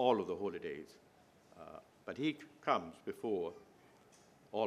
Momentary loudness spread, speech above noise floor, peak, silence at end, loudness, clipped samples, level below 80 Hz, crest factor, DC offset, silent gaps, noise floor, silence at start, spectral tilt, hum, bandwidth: 18 LU; 24 dB; -16 dBFS; 0 s; -40 LUFS; under 0.1%; -80 dBFS; 24 dB; under 0.1%; none; -65 dBFS; 0 s; -6 dB/octave; none; 13 kHz